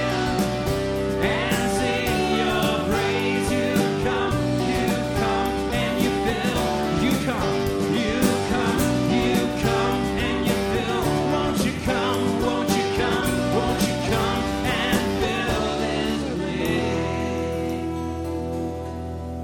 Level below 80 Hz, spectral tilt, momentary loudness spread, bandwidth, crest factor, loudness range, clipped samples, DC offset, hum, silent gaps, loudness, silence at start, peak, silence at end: -38 dBFS; -5 dB/octave; 5 LU; 19 kHz; 16 dB; 2 LU; under 0.1%; under 0.1%; none; none; -23 LUFS; 0 s; -6 dBFS; 0 s